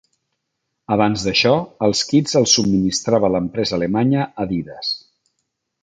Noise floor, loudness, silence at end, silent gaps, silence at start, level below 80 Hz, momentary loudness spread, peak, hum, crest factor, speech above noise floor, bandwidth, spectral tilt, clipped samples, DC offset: -76 dBFS; -18 LUFS; 0.85 s; none; 0.9 s; -48 dBFS; 10 LU; -2 dBFS; none; 18 dB; 58 dB; 9.4 kHz; -4.5 dB/octave; under 0.1%; under 0.1%